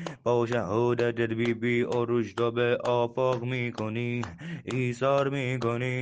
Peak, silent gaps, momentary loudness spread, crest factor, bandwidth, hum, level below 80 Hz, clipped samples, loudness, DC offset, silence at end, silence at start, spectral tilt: -12 dBFS; none; 6 LU; 16 dB; 9.2 kHz; none; -64 dBFS; under 0.1%; -28 LUFS; under 0.1%; 0 s; 0 s; -7 dB/octave